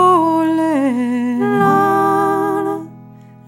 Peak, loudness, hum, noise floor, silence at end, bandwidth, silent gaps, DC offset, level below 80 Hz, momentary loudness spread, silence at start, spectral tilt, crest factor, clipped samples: -2 dBFS; -15 LUFS; none; -39 dBFS; 0.3 s; 16.5 kHz; none; under 0.1%; -64 dBFS; 8 LU; 0 s; -7 dB/octave; 12 dB; under 0.1%